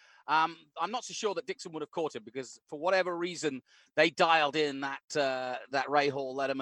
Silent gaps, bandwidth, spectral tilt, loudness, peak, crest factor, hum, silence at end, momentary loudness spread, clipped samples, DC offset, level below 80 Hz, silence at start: 5.04-5.08 s; 11.5 kHz; -3.5 dB/octave; -31 LUFS; -10 dBFS; 22 dB; none; 0 s; 13 LU; under 0.1%; under 0.1%; -84 dBFS; 0.3 s